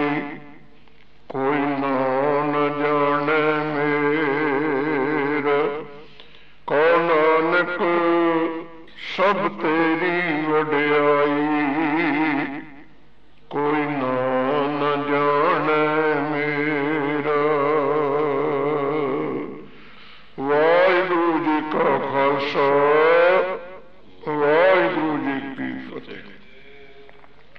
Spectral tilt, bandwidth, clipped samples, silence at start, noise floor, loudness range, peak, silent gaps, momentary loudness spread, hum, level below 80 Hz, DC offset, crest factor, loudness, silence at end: -7.5 dB/octave; 6.2 kHz; under 0.1%; 0 s; -55 dBFS; 4 LU; -6 dBFS; none; 13 LU; none; -62 dBFS; 0.8%; 14 dB; -20 LUFS; 0.55 s